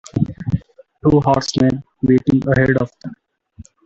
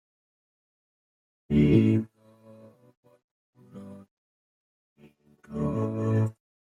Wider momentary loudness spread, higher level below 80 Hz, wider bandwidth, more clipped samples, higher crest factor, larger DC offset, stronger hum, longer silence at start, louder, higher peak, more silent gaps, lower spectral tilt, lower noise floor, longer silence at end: second, 10 LU vs 25 LU; first, -42 dBFS vs -52 dBFS; about the same, 8 kHz vs 7.6 kHz; neither; second, 16 dB vs 22 dB; neither; neither; second, 0.15 s vs 1.5 s; first, -17 LUFS vs -25 LUFS; first, -2 dBFS vs -8 dBFS; second, none vs 2.97-3.03 s, 3.24-3.53 s, 4.11-4.96 s; second, -7 dB/octave vs -9.5 dB/octave; second, -43 dBFS vs -58 dBFS; about the same, 0.25 s vs 0.35 s